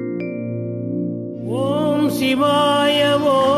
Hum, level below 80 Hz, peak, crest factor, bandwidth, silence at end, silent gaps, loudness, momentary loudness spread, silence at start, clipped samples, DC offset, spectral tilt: none; -60 dBFS; -4 dBFS; 14 dB; 14 kHz; 0 s; none; -18 LUFS; 10 LU; 0 s; under 0.1%; under 0.1%; -5.5 dB/octave